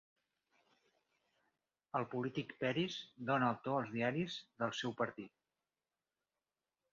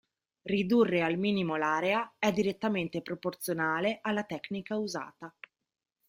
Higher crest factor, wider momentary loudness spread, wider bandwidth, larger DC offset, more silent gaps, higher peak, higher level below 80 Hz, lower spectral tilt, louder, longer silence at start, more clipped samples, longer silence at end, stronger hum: about the same, 20 dB vs 18 dB; second, 8 LU vs 11 LU; second, 7.4 kHz vs 16 kHz; neither; neither; second, -22 dBFS vs -14 dBFS; second, -80 dBFS vs -70 dBFS; second, -4 dB/octave vs -5.5 dB/octave; second, -40 LUFS vs -31 LUFS; first, 1.95 s vs 0.45 s; neither; first, 1.65 s vs 0.8 s; neither